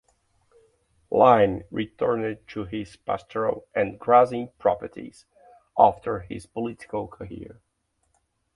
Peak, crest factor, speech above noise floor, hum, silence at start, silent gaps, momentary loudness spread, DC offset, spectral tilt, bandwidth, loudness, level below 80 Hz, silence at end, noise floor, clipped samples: -2 dBFS; 24 dB; 48 dB; none; 1.1 s; none; 19 LU; under 0.1%; -7 dB/octave; 11 kHz; -24 LUFS; -56 dBFS; 1.05 s; -72 dBFS; under 0.1%